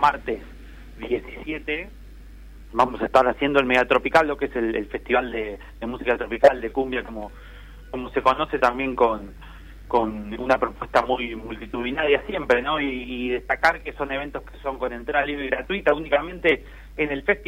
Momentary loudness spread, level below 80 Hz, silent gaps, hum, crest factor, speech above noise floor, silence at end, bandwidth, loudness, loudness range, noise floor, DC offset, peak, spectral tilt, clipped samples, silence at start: 14 LU; -42 dBFS; none; none; 20 dB; 19 dB; 0 s; 16 kHz; -23 LUFS; 4 LU; -42 dBFS; under 0.1%; -4 dBFS; -5.5 dB/octave; under 0.1%; 0 s